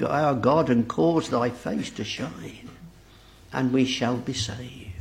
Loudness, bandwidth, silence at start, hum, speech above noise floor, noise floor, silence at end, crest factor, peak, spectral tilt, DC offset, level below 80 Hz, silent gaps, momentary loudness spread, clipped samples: -25 LUFS; 13 kHz; 0 s; none; 26 dB; -51 dBFS; 0 s; 20 dB; -6 dBFS; -5.5 dB/octave; under 0.1%; -54 dBFS; none; 17 LU; under 0.1%